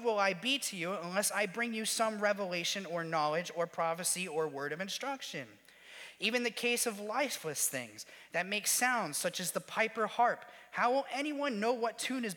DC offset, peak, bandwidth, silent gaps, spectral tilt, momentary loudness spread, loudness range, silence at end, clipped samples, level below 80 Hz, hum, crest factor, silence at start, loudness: under 0.1%; -16 dBFS; 19 kHz; none; -2 dB/octave; 8 LU; 3 LU; 0 s; under 0.1%; -86 dBFS; none; 18 dB; 0 s; -34 LUFS